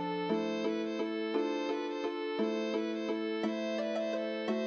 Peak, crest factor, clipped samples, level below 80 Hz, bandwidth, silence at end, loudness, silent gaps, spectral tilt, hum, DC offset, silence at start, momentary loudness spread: -18 dBFS; 16 dB; under 0.1%; -88 dBFS; 7.6 kHz; 0 s; -35 LUFS; none; -5.5 dB/octave; none; under 0.1%; 0 s; 2 LU